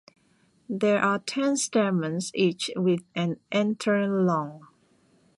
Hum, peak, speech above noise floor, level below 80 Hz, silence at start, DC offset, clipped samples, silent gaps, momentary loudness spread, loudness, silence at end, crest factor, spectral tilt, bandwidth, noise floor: none; -10 dBFS; 39 dB; -72 dBFS; 0.7 s; under 0.1%; under 0.1%; none; 6 LU; -26 LUFS; 0.75 s; 18 dB; -5 dB/octave; 11.5 kHz; -64 dBFS